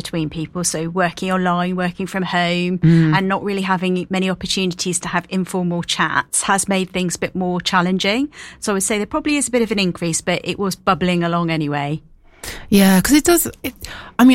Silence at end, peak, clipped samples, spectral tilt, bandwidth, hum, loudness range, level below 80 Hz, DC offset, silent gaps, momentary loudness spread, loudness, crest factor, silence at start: 0 s; 0 dBFS; under 0.1%; -4.5 dB/octave; 16.5 kHz; none; 2 LU; -44 dBFS; under 0.1%; none; 10 LU; -18 LUFS; 18 dB; 0 s